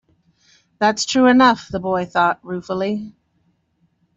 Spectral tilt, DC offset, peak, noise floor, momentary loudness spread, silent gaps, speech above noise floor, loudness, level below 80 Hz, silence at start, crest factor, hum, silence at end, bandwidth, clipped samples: -4 dB/octave; under 0.1%; -2 dBFS; -64 dBFS; 14 LU; none; 47 dB; -18 LUFS; -56 dBFS; 0.8 s; 18 dB; none; 1.05 s; 8 kHz; under 0.1%